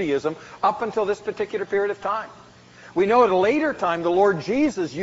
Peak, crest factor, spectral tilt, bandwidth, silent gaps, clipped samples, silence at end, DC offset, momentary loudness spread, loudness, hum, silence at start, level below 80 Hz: -6 dBFS; 16 dB; -4 dB/octave; 8 kHz; none; under 0.1%; 0 s; under 0.1%; 10 LU; -22 LUFS; none; 0 s; -58 dBFS